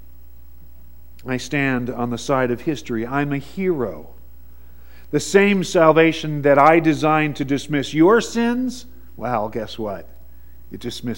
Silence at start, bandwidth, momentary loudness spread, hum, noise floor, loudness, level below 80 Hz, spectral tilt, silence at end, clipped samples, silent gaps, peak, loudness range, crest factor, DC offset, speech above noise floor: 1.25 s; 16.5 kHz; 16 LU; none; -45 dBFS; -19 LUFS; -46 dBFS; -5.5 dB/octave; 0 s; under 0.1%; none; 0 dBFS; 8 LU; 20 dB; 1%; 27 dB